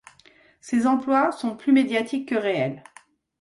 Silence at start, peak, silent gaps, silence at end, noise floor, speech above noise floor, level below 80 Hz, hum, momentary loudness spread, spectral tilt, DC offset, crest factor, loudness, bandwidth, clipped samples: 0.65 s; -8 dBFS; none; 0.6 s; -56 dBFS; 34 dB; -68 dBFS; none; 7 LU; -5.5 dB/octave; under 0.1%; 16 dB; -23 LUFS; 11.5 kHz; under 0.1%